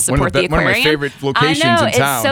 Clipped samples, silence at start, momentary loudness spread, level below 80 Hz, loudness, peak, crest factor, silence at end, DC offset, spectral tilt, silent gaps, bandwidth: under 0.1%; 0 s; 3 LU; -32 dBFS; -14 LUFS; -2 dBFS; 12 dB; 0 s; under 0.1%; -4 dB/octave; none; 20 kHz